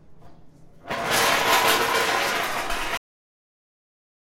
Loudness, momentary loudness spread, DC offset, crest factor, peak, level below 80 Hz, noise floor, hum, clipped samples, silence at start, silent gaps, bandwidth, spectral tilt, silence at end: -22 LUFS; 11 LU; under 0.1%; 18 dB; -6 dBFS; -48 dBFS; -47 dBFS; none; under 0.1%; 0.1 s; none; 16 kHz; -1 dB/octave; 1.35 s